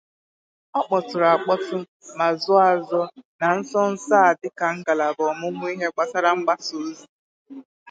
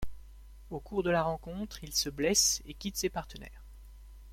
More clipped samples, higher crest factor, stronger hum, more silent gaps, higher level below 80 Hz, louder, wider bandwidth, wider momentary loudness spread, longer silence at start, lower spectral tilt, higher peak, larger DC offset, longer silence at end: neither; about the same, 18 dB vs 22 dB; neither; first, 1.88-2.00 s, 3.25-3.39 s, 7.09-7.45 s, 7.65-7.86 s vs none; second, -78 dBFS vs -50 dBFS; first, -22 LUFS vs -31 LUFS; second, 9 kHz vs 16.5 kHz; second, 12 LU vs 21 LU; first, 0.75 s vs 0 s; first, -4.5 dB/octave vs -2.5 dB/octave; first, -4 dBFS vs -12 dBFS; neither; about the same, 0 s vs 0 s